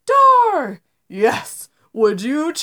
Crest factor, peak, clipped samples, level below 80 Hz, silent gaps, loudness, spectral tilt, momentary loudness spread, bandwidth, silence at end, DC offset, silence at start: 14 dB; -2 dBFS; under 0.1%; -74 dBFS; none; -16 LUFS; -4 dB/octave; 21 LU; 19.5 kHz; 0 s; under 0.1%; 0.05 s